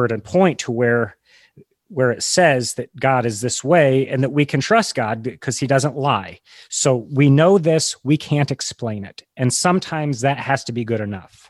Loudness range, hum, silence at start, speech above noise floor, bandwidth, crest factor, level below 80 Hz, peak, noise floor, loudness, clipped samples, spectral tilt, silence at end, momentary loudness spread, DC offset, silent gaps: 2 LU; none; 0 s; 33 dB; 12.5 kHz; 16 dB; -56 dBFS; -2 dBFS; -51 dBFS; -18 LUFS; under 0.1%; -5 dB/octave; 0.3 s; 11 LU; under 0.1%; none